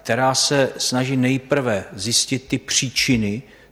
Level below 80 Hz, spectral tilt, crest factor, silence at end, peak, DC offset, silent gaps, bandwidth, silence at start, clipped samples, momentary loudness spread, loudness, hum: -50 dBFS; -3.5 dB/octave; 16 dB; 0.3 s; -4 dBFS; under 0.1%; none; 16 kHz; 0.05 s; under 0.1%; 7 LU; -19 LUFS; none